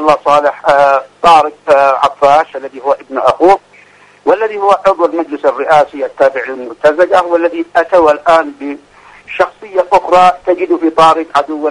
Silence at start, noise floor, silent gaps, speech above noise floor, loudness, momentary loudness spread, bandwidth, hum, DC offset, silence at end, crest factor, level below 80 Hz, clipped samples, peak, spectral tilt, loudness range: 0 s; -42 dBFS; none; 32 dB; -10 LUFS; 8 LU; 11 kHz; none; under 0.1%; 0 s; 10 dB; -48 dBFS; 0.7%; 0 dBFS; -4.5 dB/octave; 2 LU